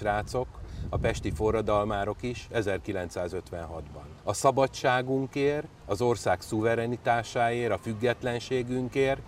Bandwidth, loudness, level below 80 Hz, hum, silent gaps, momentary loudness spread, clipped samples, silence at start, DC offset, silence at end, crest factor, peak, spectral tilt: 16 kHz; -29 LUFS; -46 dBFS; none; none; 10 LU; under 0.1%; 0 s; under 0.1%; 0 s; 20 dB; -8 dBFS; -5.5 dB/octave